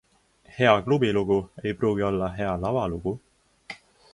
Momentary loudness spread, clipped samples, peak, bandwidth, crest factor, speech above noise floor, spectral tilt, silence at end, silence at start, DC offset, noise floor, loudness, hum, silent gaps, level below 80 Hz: 21 LU; under 0.1%; -4 dBFS; 11 kHz; 22 dB; 34 dB; -7 dB/octave; 0.4 s; 0.55 s; under 0.1%; -58 dBFS; -25 LUFS; none; none; -48 dBFS